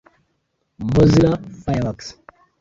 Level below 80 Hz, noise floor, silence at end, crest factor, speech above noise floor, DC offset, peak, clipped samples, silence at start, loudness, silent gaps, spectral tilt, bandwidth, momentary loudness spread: -38 dBFS; -70 dBFS; 0.5 s; 18 dB; 53 dB; under 0.1%; -2 dBFS; under 0.1%; 0.8 s; -18 LUFS; none; -7.5 dB/octave; 7.8 kHz; 18 LU